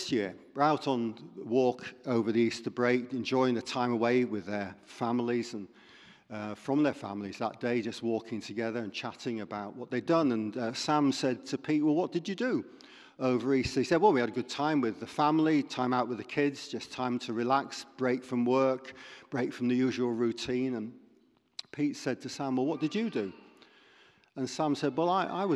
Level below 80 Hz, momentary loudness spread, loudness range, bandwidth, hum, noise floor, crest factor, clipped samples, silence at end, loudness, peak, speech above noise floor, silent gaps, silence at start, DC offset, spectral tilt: -66 dBFS; 11 LU; 5 LU; 11.5 kHz; none; -66 dBFS; 20 dB; under 0.1%; 0 s; -31 LUFS; -10 dBFS; 36 dB; none; 0 s; under 0.1%; -5.5 dB/octave